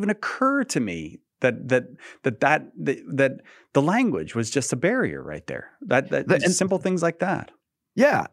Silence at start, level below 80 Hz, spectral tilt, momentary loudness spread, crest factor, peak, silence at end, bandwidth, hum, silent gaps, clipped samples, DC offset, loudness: 0 s; -62 dBFS; -5 dB/octave; 13 LU; 20 dB; -4 dBFS; 0.05 s; 14.5 kHz; none; none; under 0.1%; under 0.1%; -23 LUFS